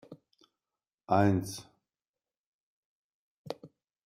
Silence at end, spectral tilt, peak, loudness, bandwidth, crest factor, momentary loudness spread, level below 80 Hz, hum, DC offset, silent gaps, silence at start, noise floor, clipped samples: 0.4 s; -6.5 dB/octave; -12 dBFS; -29 LUFS; 15 kHz; 24 dB; 19 LU; -70 dBFS; none; under 0.1%; 0.94-0.98 s, 2.08-2.14 s, 2.37-3.45 s; 0.1 s; under -90 dBFS; under 0.1%